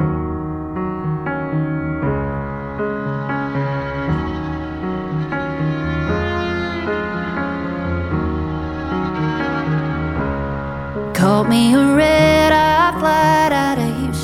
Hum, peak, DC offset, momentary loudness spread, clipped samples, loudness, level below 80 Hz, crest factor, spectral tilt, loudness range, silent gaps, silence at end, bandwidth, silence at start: none; -2 dBFS; under 0.1%; 12 LU; under 0.1%; -18 LUFS; -34 dBFS; 16 dB; -6.5 dB/octave; 8 LU; none; 0 s; 16 kHz; 0 s